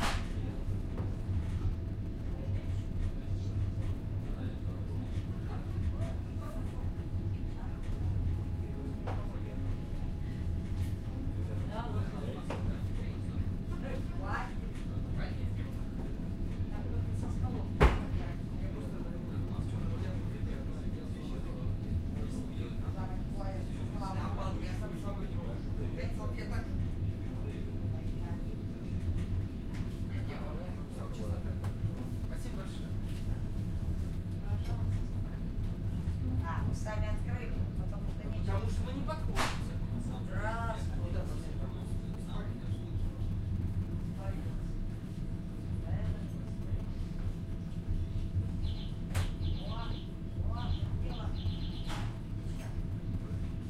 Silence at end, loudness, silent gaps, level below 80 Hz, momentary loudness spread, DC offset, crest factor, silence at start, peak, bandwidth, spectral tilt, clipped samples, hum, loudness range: 0 s; -38 LUFS; none; -40 dBFS; 5 LU; under 0.1%; 24 dB; 0 s; -10 dBFS; 12.5 kHz; -7 dB/octave; under 0.1%; none; 4 LU